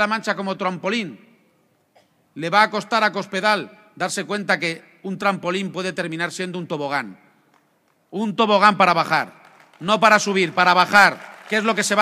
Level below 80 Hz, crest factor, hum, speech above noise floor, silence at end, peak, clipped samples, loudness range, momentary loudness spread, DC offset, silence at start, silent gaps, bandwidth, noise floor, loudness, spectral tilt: -70 dBFS; 20 dB; none; 44 dB; 0 s; 0 dBFS; under 0.1%; 9 LU; 15 LU; under 0.1%; 0 s; none; 15.5 kHz; -63 dBFS; -19 LUFS; -3.5 dB/octave